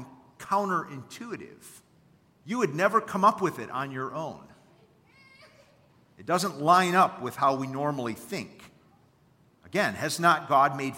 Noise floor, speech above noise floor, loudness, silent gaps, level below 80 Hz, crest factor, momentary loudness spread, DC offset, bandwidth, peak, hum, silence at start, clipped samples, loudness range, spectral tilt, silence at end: -62 dBFS; 36 dB; -26 LUFS; none; -72 dBFS; 22 dB; 18 LU; under 0.1%; 16.5 kHz; -8 dBFS; none; 0 s; under 0.1%; 4 LU; -4.5 dB/octave; 0 s